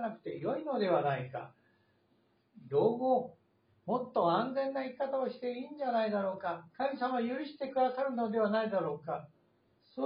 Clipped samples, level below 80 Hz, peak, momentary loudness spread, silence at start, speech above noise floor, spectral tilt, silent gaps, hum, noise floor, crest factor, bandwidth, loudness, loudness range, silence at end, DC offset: under 0.1%; -82 dBFS; -18 dBFS; 9 LU; 0 s; 39 dB; -5 dB/octave; none; none; -72 dBFS; 18 dB; 5 kHz; -34 LUFS; 2 LU; 0 s; under 0.1%